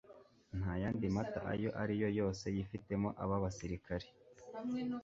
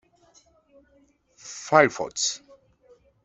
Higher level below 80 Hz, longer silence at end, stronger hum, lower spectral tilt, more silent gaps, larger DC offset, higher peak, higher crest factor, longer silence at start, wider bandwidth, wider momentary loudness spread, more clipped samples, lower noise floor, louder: first, -56 dBFS vs -66 dBFS; second, 0 s vs 0.85 s; neither; first, -7 dB/octave vs -2.5 dB/octave; neither; neither; second, -22 dBFS vs -2 dBFS; second, 16 dB vs 26 dB; second, 0.1 s vs 1.45 s; about the same, 7.6 kHz vs 8.2 kHz; second, 9 LU vs 21 LU; neither; about the same, -62 dBFS vs -62 dBFS; second, -40 LUFS vs -22 LUFS